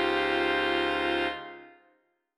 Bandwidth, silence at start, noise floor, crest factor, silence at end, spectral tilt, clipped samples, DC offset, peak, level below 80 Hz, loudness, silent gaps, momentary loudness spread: 11.5 kHz; 0 s; -70 dBFS; 16 dB; 0.65 s; -4.5 dB/octave; under 0.1%; under 0.1%; -14 dBFS; -56 dBFS; -27 LUFS; none; 11 LU